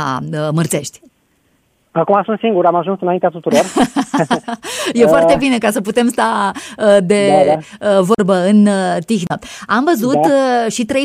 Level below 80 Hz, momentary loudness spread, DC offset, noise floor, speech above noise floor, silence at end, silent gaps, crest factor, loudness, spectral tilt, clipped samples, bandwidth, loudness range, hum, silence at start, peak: -50 dBFS; 8 LU; under 0.1%; -59 dBFS; 45 dB; 0 s; none; 14 dB; -14 LUFS; -5.5 dB/octave; under 0.1%; 15.5 kHz; 4 LU; none; 0 s; 0 dBFS